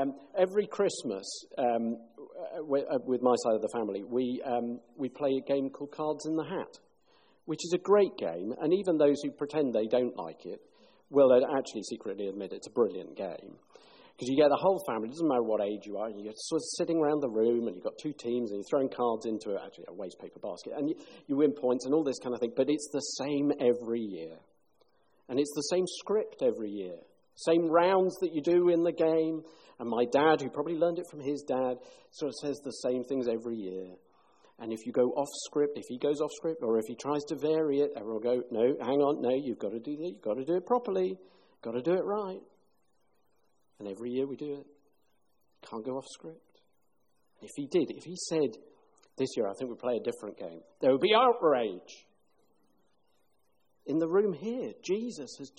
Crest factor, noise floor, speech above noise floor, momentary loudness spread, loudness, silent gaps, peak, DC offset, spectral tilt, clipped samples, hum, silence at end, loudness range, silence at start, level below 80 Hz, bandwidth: 18 dB; -77 dBFS; 46 dB; 15 LU; -31 LUFS; none; -14 dBFS; under 0.1%; -5 dB/octave; under 0.1%; none; 0.1 s; 8 LU; 0 s; -76 dBFS; 10 kHz